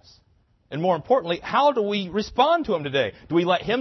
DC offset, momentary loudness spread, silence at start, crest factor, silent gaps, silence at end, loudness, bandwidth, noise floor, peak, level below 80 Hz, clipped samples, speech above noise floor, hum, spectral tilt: under 0.1%; 6 LU; 0.7 s; 18 dB; none; 0 s; -22 LUFS; 6.2 kHz; -62 dBFS; -6 dBFS; -54 dBFS; under 0.1%; 40 dB; none; -6 dB/octave